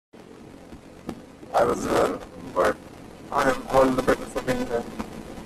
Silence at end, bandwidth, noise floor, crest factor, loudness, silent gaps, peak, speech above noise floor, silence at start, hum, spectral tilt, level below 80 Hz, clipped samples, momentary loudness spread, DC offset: 0 s; 14.5 kHz; -45 dBFS; 20 dB; -24 LUFS; none; -6 dBFS; 22 dB; 0.15 s; none; -5 dB/octave; -46 dBFS; under 0.1%; 23 LU; under 0.1%